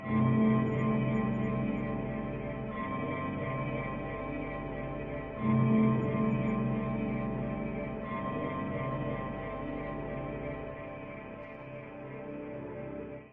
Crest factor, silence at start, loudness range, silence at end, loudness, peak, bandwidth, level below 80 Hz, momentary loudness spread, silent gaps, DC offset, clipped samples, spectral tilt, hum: 16 dB; 0 s; 9 LU; 0 s; -34 LUFS; -16 dBFS; 3.8 kHz; -50 dBFS; 15 LU; none; under 0.1%; under 0.1%; -10.5 dB/octave; none